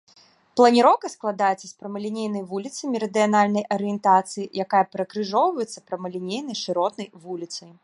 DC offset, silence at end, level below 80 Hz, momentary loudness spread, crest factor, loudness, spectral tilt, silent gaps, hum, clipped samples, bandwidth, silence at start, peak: under 0.1%; 0.15 s; -74 dBFS; 14 LU; 20 dB; -23 LUFS; -5 dB/octave; none; none; under 0.1%; 11.5 kHz; 0.55 s; -2 dBFS